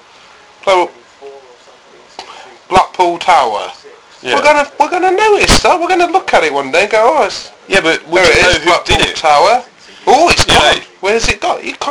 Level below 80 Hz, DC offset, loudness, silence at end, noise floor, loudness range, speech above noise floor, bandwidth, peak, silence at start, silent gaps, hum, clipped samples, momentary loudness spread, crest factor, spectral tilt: -30 dBFS; under 0.1%; -10 LUFS; 0 s; -41 dBFS; 6 LU; 30 dB; over 20 kHz; 0 dBFS; 0.65 s; none; none; 0.3%; 10 LU; 12 dB; -3 dB/octave